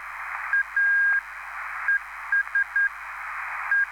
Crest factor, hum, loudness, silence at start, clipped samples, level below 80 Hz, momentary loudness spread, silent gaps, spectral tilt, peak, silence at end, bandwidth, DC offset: 12 dB; none; -24 LUFS; 0 s; under 0.1%; -62 dBFS; 13 LU; none; 0 dB/octave; -14 dBFS; 0 s; 17.5 kHz; under 0.1%